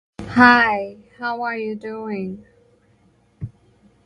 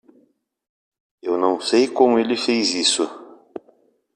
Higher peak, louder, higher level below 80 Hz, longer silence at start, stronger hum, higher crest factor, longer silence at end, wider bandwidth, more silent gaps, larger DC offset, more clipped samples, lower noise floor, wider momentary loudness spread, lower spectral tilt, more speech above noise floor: about the same, 0 dBFS vs -2 dBFS; about the same, -18 LUFS vs -19 LUFS; first, -52 dBFS vs -70 dBFS; second, 0.2 s vs 1.25 s; neither; about the same, 22 dB vs 20 dB; about the same, 0.55 s vs 0.6 s; about the same, 9.6 kHz vs 10 kHz; neither; neither; neither; about the same, -58 dBFS vs -61 dBFS; first, 25 LU vs 22 LU; first, -6 dB/octave vs -2.5 dB/octave; second, 39 dB vs 43 dB